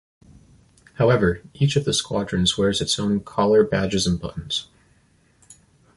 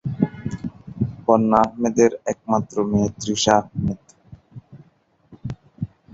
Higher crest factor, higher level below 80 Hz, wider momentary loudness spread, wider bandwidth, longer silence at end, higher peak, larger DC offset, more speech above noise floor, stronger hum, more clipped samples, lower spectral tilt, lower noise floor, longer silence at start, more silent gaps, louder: about the same, 18 dB vs 20 dB; about the same, -44 dBFS vs -46 dBFS; second, 9 LU vs 17 LU; first, 11.5 kHz vs 8 kHz; first, 1.35 s vs 0.3 s; about the same, -4 dBFS vs -2 dBFS; neither; about the same, 39 dB vs 40 dB; neither; neither; about the same, -5 dB/octave vs -5.5 dB/octave; about the same, -59 dBFS vs -59 dBFS; first, 1 s vs 0.05 s; neither; about the same, -21 LUFS vs -21 LUFS